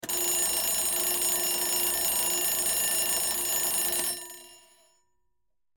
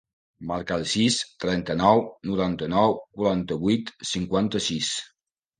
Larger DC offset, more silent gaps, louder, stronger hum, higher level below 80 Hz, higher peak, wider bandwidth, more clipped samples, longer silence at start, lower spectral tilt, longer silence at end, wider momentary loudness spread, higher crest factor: neither; neither; about the same, -24 LUFS vs -25 LUFS; neither; second, -58 dBFS vs -52 dBFS; second, -14 dBFS vs -4 dBFS; first, 19 kHz vs 9.8 kHz; neither; second, 0.05 s vs 0.4 s; second, 0.5 dB/octave vs -4.5 dB/octave; first, 1.2 s vs 0.55 s; second, 3 LU vs 8 LU; second, 16 dB vs 22 dB